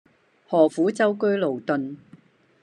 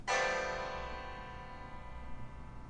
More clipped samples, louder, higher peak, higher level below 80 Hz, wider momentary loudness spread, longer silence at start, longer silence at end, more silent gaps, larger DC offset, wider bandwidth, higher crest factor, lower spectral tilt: neither; first, -22 LUFS vs -40 LUFS; first, -6 dBFS vs -22 dBFS; second, -78 dBFS vs -52 dBFS; second, 10 LU vs 17 LU; first, 0.5 s vs 0 s; first, 0.65 s vs 0 s; neither; neither; about the same, 10.5 kHz vs 10.5 kHz; about the same, 18 dB vs 18 dB; first, -6.5 dB/octave vs -3 dB/octave